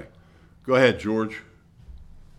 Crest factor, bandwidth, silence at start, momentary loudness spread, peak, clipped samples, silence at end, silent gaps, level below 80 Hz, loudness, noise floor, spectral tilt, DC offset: 22 dB; 11 kHz; 0 s; 21 LU; -4 dBFS; under 0.1%; 0.35 s; none; -50 dBFS; -22 LUFS; -53 dBFS; -6 dB/octave; under 0.1%